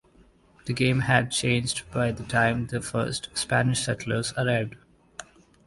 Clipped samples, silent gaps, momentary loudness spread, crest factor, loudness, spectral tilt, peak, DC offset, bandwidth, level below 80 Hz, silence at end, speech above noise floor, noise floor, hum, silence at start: under 0.1%; none; 15 LU; 20 dB; -26 LUFS; -4.5 dB/octave; -6 dBFS; under 0.1%; 11.5 kHz; -52 dBFS; 0.45 s; 32 dB; -58 dBFS; none; 0.65 s